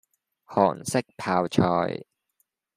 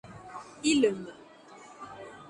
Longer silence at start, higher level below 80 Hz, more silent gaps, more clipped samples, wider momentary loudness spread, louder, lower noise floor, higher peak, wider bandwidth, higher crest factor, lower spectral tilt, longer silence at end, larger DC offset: first, 0.5 s vs 0.05 s; about the same, -66 dBFS vs -66 dBFS; neither; neither; second, 8 LU vs 25 LU; first, -25 LUFS vs -28 LUFS; first, -74 dBFS vs -52 dBFS; first, -4 dBFS vs -12 dBFS; first, 15 kHz vs 11.5 kHz; about the same, 22 dB vs 20 dB; first, -6 dB/octave vs -3.5 dB/octave; first, 0.8 s vs 0 s; neither